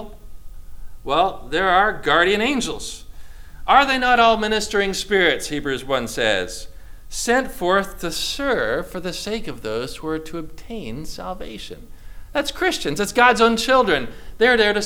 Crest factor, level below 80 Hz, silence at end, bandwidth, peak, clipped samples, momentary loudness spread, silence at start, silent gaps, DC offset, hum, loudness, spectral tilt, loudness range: 20 dB; -38 dBFS; 0 s; 18 kHz; 0 dBFS; under 0.1%; 17 LU; 0 s; none; under 0.1%; none; -19 LUFS; -3 dB/octave; 9 LU